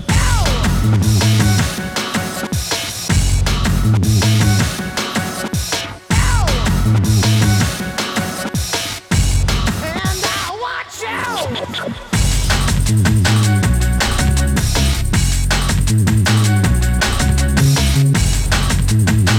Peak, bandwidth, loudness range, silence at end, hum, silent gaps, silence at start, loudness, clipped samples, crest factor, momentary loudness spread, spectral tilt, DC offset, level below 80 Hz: -2 dBFS; 18.5 kHz; 4 LU; 0 s; none; none; 0 s; -16 LUFS; under 0.1%; 14 dB; 7 LU; -4.5 dB/octave; under 0.1%; -20 dBFS